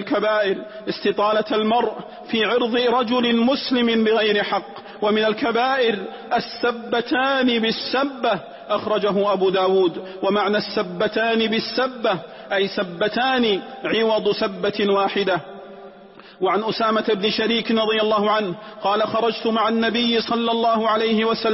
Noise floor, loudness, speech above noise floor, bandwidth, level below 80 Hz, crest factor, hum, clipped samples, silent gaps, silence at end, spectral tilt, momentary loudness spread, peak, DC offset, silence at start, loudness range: -44 dBFS; -20 LUFS; 24 dB; 5.8 kHz; -62 dBFS; 12 dB; none; under 0.1%; none; 0 s; -8 dB/octave; 7 LU; -8 dBFS; under 0.1%; 0 s; 2 LU